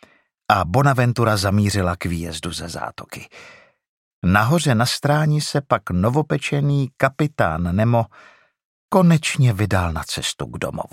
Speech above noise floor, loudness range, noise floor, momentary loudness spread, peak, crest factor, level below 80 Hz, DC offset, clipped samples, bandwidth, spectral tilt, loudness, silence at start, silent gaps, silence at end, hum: 20 dB; 3 LU; -39 dBFS; 11 LU; 0 dBFS; 20 dB; -44 dBFS; under 0.1%; under 0.1%; 16 kHz; -5.5 dB/octave; -19 LUFS; 0.5 s; 3.88-4.22 s, 8.65-8.89 s; 0.05 s; none